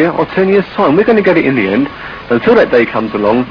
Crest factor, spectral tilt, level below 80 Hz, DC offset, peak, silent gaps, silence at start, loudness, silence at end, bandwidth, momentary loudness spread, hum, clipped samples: 10 dB; -8.5 dB/octave; -42 dBFS; under 0.1%; 0 dBFS; none; 0 s; -11 LUFS; 0 s; 5.4 kHz; 6 LU; none; 0.5%